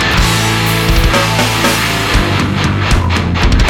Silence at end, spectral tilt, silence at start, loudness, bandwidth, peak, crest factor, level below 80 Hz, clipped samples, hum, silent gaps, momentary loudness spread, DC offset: 0 s; -4 dB/octave; 0 s; -12 LUFS; 19.5 kHz; 0 dBFS; 12 dB; -18 dBFS; under 0.1%; none; none; 2 LU; under 0.1%